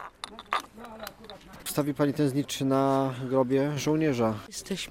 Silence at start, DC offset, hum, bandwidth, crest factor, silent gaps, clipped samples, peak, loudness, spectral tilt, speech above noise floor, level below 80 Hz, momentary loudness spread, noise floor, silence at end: 0 s; under 0.1%; none; 16.5 kHz; 20 dB; none; under 0.1%; -8 dBFS; -28 LUFS; -5.5 dB/octave; 20 dB; -60 dBFS; 17 LU; -47 dBFS; 0 s